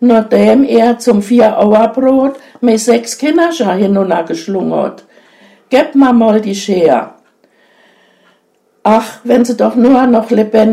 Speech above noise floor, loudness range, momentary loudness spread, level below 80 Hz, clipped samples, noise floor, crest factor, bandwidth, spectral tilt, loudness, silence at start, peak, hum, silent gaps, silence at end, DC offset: 46 dB; 4 LU; 8 LU; -52 dBFS; 0.3%; -55 dBFS; 10 dB; 14.5 kHz; -5.5 dB/octave; -10 LUFS; 0 s; 0 dBFS; none; none; 0 s; under 0.1%